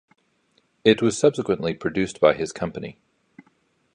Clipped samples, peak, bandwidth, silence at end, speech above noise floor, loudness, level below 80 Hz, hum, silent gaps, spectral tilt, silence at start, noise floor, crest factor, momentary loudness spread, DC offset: under 0.1%; -2 dBFS; 11 kHz; 1.05 s; 45 dB; -22 LUFS; -56 dBFS; none; none; -5 dB/octave; 0.85 s; -66 dBFS; 22 dB; 12 LU; under 0.1%